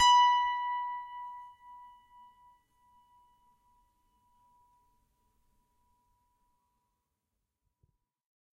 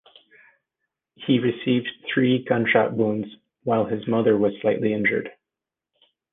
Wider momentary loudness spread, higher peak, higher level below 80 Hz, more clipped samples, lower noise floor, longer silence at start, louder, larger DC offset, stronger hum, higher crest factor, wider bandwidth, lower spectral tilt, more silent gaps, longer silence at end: first, 30 LU vs 10 LU; second, -14 dBFS vs -4 dBFS; second, -74 dBFS vs -64 dBFS; neither; about the same, -86 dBFS vs -88 dBFS; second, 0 s vs 1.2 s; second, -28 LUFS vs -22 LUFS; neither; neither; about the same, 22 dB vs 20 dB; first, 11.5 kHz vs 3.9 kHz; second, 3 dB/octave vs -9.5 dB/octave; neither; first, 6.75 s vs 1.05 s